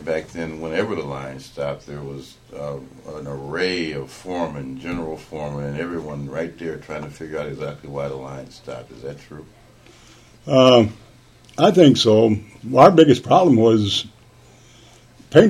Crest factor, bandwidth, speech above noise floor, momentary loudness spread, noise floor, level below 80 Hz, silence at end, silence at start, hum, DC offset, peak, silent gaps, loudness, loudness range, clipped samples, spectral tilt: 20 dB; 13.5 kHz; 29 dB; 22 LU; -49 dBFS; -50 dBFS; 0 s; 0 s; none; under 0.1%; 0 dBFS; none; -18 LUFS; 16 LU; under 0.1%; -6 dB/octave